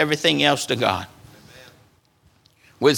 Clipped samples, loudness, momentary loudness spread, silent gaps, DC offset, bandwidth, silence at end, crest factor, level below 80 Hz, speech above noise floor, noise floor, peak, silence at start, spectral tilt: under 0.1%; -20 LUFS; 11 LU; none; under 0.1%; 19 kHz; 0 s; 22 dB; -62 dBFS; 39 dB; -59 dBFS; 0 dBFS; 0 s; -3.5 dB/octave